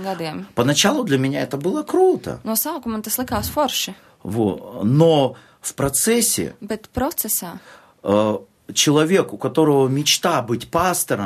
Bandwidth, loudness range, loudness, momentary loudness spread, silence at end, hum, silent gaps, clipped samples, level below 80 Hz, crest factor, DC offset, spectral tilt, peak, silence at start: 14 kHz; 3 LU; -19 LUFS; 12 LU; 0 s; none; none; under 0.1%; -48 dBFS; 18 dB; under 0.1%; -4 dB/octave; -2 dBFS; 0 s